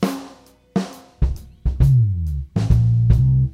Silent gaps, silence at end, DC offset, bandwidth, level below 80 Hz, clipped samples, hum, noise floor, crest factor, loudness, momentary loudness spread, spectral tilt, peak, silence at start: none; 0.05 s; under 0.1%; 12.5 kHz; -24 dBFS; under 0.1%; none; -45 dBFS; 16 dB; -19 LUFS; 12 LU; -8.5 dB/octave; -2 dBFS; 0 s